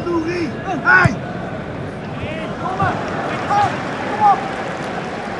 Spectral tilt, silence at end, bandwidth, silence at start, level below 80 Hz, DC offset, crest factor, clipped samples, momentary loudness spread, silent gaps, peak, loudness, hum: -6 dB/octave; 0 s; 11.5 kHz; 0 s; -44 dBFS; under 0.1%; 18 dB; under 0.1%; 14 LU; none; 0 dBFS; -19 LUFS; none